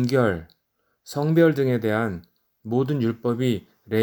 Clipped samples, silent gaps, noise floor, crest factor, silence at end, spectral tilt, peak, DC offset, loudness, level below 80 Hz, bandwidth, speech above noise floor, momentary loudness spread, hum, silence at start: under 0.1%; none; -72 dBFS; 18 dB; 0 s; -7.5 dB/octave; -6 dBFS; under 0.1%; -23 LUFS; -56 dBFS; 20 kHz; 51 dB; 14 LU; none; 0 s